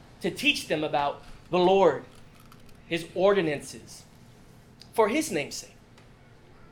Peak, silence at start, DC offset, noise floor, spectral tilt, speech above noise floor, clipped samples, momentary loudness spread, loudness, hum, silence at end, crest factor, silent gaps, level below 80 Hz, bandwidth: -8 dBFS; 0.2 s; under 0.1%; -53 dBFS; -4 dB/octave; 27 dB; under 0.1%; 18 LU; -26 LUFS; none; 1.05 s; 20 dB; none; -56 dBFS; 18 kHz